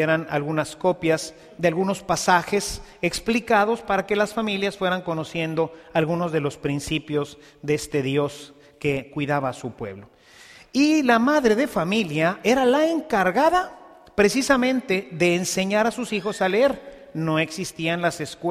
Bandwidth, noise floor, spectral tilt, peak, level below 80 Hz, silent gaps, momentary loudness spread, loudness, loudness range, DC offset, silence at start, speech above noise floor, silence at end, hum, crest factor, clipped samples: 15.5 kHz; -48 dBFS; -5 dB/octave; -4 dBFS; -52 dBFS; none; 10 LU; -22 LUFS; 6 LU; under 0.1%; 0 s; 26 dB; 0 s; none; 18 dB; under 0.1%